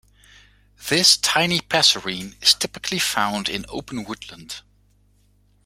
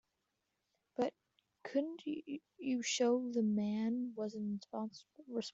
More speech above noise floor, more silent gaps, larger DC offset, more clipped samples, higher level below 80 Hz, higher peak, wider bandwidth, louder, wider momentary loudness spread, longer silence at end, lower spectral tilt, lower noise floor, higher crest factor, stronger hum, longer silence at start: second, 38 dB vs 48 dB; neither; neither; neither; first, -54 dBFS vs -84 dBFS; first, 0 dBFS vs -22 dBFS; first, 16.5 kHz vs 8.2 kHz; first, -18 LUFS vs -39 LUFS; first, 20 LU vs 13 LU; first, 1.05 s vs 0.05 s; second, -1.5 dB/octave vs -4.5 dB/octave; second, -59 dBFS vs -86 dBFS; first, 22 dB vs 16 dB; first, 50 Hz at -50 dBFS vs none; second, 0.8 s vs 1 s